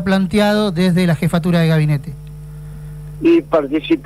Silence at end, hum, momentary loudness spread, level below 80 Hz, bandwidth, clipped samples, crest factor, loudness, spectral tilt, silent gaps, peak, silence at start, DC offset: 0 s; 50 Hz at -30 dBFS; 18 LU; -38 dBFS; 14.5 kHz; under 0.1%; 12 dB; -15 LUFS; -7 dB/octave; none; -4 dBFS; 0 s; 0.2%